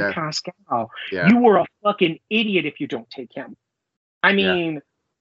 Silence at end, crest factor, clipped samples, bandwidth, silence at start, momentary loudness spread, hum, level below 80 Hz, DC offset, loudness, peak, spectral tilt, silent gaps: 0.4 s; 20 dB; under 0.1%; 7.8 kHz; 0 s; 19 LU; none; -68 dBFS; under 0.1%; -20 LUFS; -2 dBFS; -3.5 dB/octave; 3.97-4.21 s